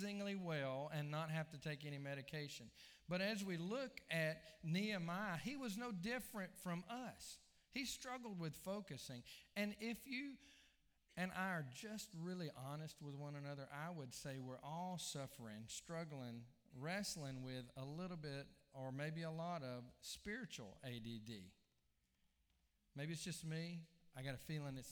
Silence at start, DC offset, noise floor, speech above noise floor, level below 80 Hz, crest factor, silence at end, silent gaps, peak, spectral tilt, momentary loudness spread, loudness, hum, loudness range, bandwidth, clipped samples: 0 s; under 0.1%; -83 dBFS; 35 dB; -76 dBFS; 20 dB; 0 s; none; -28 dBFS; -5 dB/octave; 10 LU; -49 LUFS; none; 7 LU; over 20 kHz; under 0.1%